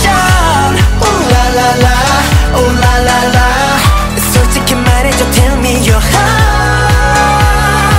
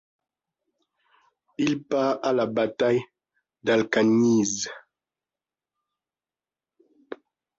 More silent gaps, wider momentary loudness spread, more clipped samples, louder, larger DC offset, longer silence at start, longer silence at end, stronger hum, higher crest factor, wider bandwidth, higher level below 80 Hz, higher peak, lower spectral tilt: neither; second, 2 LU vs 23 LU; first, 0.3% vs under 0.1%; first, -9 LUFS vs -24 LUFS; neither; second, 0 s vs 1.6 s; second, 0 s vs 0.45 s; neither; second, 8 dB vs 18 dB; first, 16.5 kHz vs 7.8 kHz; first, -14 dBFS vs -68 dBFS; first, 0 dBFS vs -8 dBFS; about the same, -4.5 dB/octave vs -4.5 dB/octave